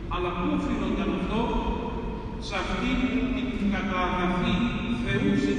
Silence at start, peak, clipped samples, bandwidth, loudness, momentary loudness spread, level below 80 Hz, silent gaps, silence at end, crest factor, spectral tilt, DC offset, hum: 0 s; -12 dBFS; under 0.1%; 9.8 kHz; -27 LUFS; 6 LU; -36 dBFS; none; 0 s; 14 dB; -6.5 dB/octave; under 0.1%; none